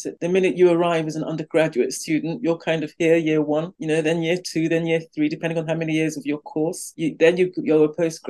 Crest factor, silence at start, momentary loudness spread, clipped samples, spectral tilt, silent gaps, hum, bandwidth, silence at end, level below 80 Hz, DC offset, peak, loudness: 16 dB; 0 s; 8 LU; under 0.1%; -5.5 dB/octave; none; none; 12.5 kHz; 0 s; -72 dBFS; under 0.1%; -4 dBFS; -21 LUFS